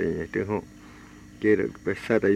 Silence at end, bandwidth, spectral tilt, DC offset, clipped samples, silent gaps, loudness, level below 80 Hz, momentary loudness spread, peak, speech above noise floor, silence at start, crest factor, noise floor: 0 s; 11.5 kHz; -7.5 dB/octave; under 0.1%; under 0.1%; none; -27 LUFS; -54 dBFS; 24 LU; -10 dBFS; 22 dB; 0 s; 16 dB; -47 dBFS